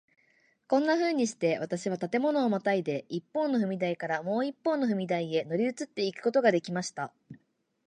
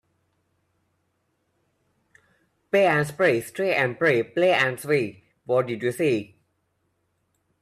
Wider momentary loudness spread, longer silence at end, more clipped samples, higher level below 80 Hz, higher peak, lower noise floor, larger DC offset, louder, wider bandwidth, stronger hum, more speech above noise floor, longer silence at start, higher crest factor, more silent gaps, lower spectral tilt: first, 8 LU vs 5 LU; second, 0.5 s vs 1.35 s; neither; second, -78 dBFS vs -68 dBFS; about the same, -10 dBFS vs -8 dBFS; second, -68 dBFS vs -73 dBFS; neither; second, -29 LUFS vs -23 LUFS; second, 10 kHz vs 14.5 kHz; neither; second, 39 dB vs 50 dB; second, 0.7 s vs 2.75 s; about the same, 20 dB vs 18 dB; neither; about the same, -5.5 dB/octave vs -5.5 dB/octave